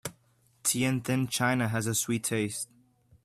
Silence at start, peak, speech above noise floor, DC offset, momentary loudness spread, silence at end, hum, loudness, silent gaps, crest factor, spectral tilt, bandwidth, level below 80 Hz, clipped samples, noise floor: 0.05 s; -12 dBFS; 37 dB; under 0.1%; 9 LU; 0.6 s; none; -29 LUFS; none; 18 dB; -4 dB/octave; 15.5 kHz; -66 dBFS; under 0.1%; -66 dBFS